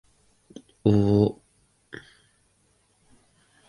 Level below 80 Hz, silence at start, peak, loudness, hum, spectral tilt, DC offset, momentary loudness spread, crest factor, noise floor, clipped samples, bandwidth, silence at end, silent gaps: -52 dBFS; 0.85 s; -6 dBFS; -23 LUFS; none; -9 dB/octave; under 0.1%; 25 LU; 22 dB; -66 dBFS; under 0.1%; 11 kHz; 2.35 s; none